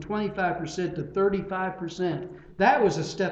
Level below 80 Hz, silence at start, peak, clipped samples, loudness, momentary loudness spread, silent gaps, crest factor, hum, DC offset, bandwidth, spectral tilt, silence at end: -54 dBFS; 0 s; -8 dBFS; under 0.1%; -27 LUFS; 9 LU; none; 18 dB; none; under 0.1%; 8.2 kHz; -6 dB/octave; 0 s